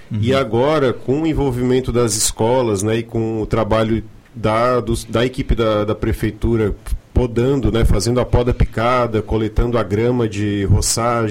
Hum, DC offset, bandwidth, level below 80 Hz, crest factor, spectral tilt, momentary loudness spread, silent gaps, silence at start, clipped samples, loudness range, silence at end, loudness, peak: none; under 0.1%; 16.5 kHz; -26 dBFS; 12 dB; -5.5 dB/octave; 5 LU; none; 0 s; under 0.1%; 1 LU; 0 s; -17 LUFS; -4 dBFS